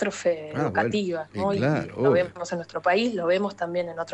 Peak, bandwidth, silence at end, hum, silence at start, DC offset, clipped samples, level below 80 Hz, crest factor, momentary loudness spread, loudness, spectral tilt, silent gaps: -8 dBFS; 9.8 kHz; 0 s; none; 0 s; under 0.1%; under 0.1%; -60 dBFS; 16 dB; 7 LU; -25 LUFS; -6 dB/octave; none